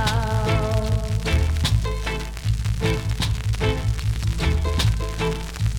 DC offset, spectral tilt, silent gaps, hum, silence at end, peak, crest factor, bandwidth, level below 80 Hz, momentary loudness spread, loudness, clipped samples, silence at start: under 0.1%; -5.5 dB/octave; none; none; 0 s; -8 dBFS; 14 dB; 17.5 kHz; -26 dBFS; 5 LU; -23 LUFS; under 0.1%; 0 s